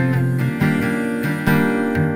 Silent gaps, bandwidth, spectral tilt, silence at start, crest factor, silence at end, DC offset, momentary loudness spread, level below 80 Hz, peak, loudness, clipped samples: none; 16 kHz; -7.5 dB/octave; 0 s; 14 dB; 0 s; under 0.1%; 4 LU; -48 dBFS; -4 dBFS; -19 LUFS; under 0.1%